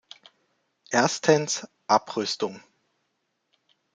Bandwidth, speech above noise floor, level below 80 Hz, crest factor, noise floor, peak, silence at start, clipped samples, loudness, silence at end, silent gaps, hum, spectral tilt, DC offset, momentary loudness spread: 9.6 kHz; 52 dB; -70 dBFS; 24 dB; -76 dBFS; -4 dBFS; 0.9 s; under 0.1%; -25 LUFS; 1.35 s; none; none; -3.5 dB/octave; under 0.1%; 9 LU